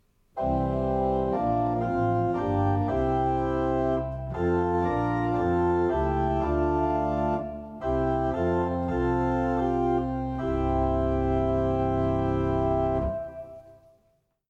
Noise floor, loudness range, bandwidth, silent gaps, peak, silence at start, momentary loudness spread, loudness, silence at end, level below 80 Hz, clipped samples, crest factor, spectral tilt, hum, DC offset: -69 dBFS; 1 LU; 7.6 kHz; none; -14 dBFS; 0.35 s; 5 LU; -26 LUFS; 0.75 s; -38 dBFS; under 0.1%; 12 dB; -9.5 dB/octave; none; under 0.1%